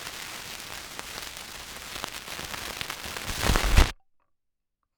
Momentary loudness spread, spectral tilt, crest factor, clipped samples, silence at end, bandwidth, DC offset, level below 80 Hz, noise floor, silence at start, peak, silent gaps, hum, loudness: 14 LU; -3 dB/octave; 26 dB; under 0.1%; 1.05 s; over 20 kHz; under 0.1%; -32 dBFS; -79 dBFS; 0 s; -4 dBFS; none; none; -31 LUFS